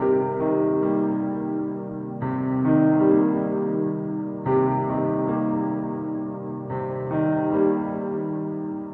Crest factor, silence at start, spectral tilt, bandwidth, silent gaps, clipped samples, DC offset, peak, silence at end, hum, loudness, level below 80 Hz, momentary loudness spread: 16 dB; 0 s; -12 dB/octave; 3.2 kHz; none; under 0.1%; under 0.1%; -8 dBFS; 0 s; none; -24 LUFS; -58 dBFS; 11 LU